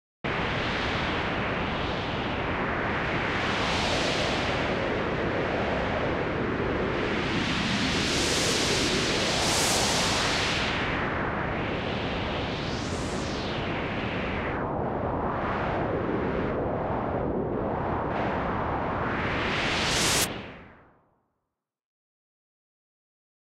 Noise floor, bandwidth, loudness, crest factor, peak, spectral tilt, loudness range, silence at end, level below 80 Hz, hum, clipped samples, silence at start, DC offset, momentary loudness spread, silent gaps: -84 dBFS; 16 kHz; -27 LUFS; 16 dB; -14 dBFS; -3.5 dB/octave; 6 LU; 2.75 s; -42 dBFS; none; under 0.1%; 0.25 s; under 0.1%; 6 LU; none